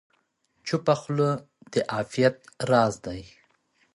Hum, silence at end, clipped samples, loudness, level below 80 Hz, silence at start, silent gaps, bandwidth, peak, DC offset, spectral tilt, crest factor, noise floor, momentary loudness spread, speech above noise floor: none; 0.7 s; under 0.1%; -26 LUFS; -60 dBFS; 0.65 s; none; 11.5 kHz; -6 dBFS; under 0.1%; -6 dB/octave; 20 dB; -71 dBFS; 14 LU; 46 dB